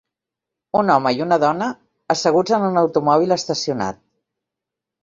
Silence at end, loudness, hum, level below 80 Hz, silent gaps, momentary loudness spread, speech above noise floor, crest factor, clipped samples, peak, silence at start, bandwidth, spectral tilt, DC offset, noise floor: 1.1 s; -18 LUFS; none; -60 dBFS; none; 9 LU; 67 dB; 18 dB; under 0.1%; -2 dBFS; 0.75 s; 8 kHz; -5 dB/octave; under 0.1%; -85 dBFS